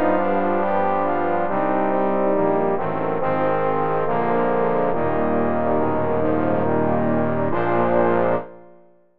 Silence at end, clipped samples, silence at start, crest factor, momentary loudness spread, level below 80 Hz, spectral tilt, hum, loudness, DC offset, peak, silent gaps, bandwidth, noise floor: 0 s; under 0.1%; 0 s; 14 dB; 3 LU; -48 dBFS; -7 dB/octave; none; -21 LUFS; 4%; -6 dBFS; none; 4.8 kHz; -52 dBFS